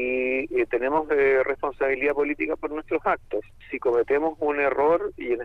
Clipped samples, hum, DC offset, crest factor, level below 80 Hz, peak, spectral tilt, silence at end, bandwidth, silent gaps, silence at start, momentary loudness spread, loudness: under 0.1%; none; under 0.1%; 14 dB; -50 dBFS; -10 dBFS; -7 dB/octave; 0 s; 4.9 kHz; none; 0 s; 7 LU; -24 LUFS